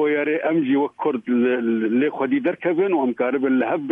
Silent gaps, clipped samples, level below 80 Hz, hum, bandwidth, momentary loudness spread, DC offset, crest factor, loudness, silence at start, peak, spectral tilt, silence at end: none; under 0.1%; -74 dBFS; none; 3.7 kHz; 2 LU; under 0.1%; 12 dB; -21 LUFS; 0 s; -8 dBFS; -9 dB/octave; 0 s